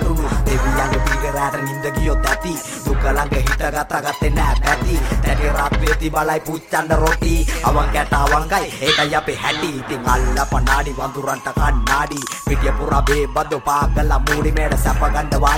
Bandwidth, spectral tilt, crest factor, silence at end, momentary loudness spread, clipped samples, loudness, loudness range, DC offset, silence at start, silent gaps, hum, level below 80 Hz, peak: 16.5 kHz; -4.5 dB/octave; 16 dB; 0 s; 5 LU; under 0.1%; -18 LUFS; 2 LU; under 0.1%; 0 s; none; none; -20 dBFS; 0 dBFS